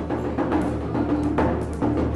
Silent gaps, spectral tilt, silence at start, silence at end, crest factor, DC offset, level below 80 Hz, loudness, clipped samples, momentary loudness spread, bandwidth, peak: none; -8.5 dB/octave; 0 s; 0 s; 14 dB; under 0.1%; -36 dBFS; -24 LUFS; under 0.1%; 3 LU; 11.5 kHz; -10 dBFS